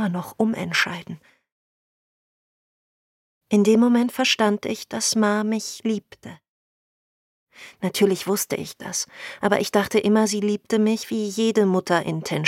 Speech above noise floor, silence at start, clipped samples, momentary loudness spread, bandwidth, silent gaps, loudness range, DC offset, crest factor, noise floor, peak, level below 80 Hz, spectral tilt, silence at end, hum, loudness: over 68 dB; 0 s; under 0.1%; 10 LU; 16.5 kHz; 1.52-3.41 s, 6.49-7.47 s; 6 LU; under 0.1%; 20 dB; under -90 dBFS; -4 dBFS; -66 dBFS; -4 dB/octave; 0 s; none; -22 LUFS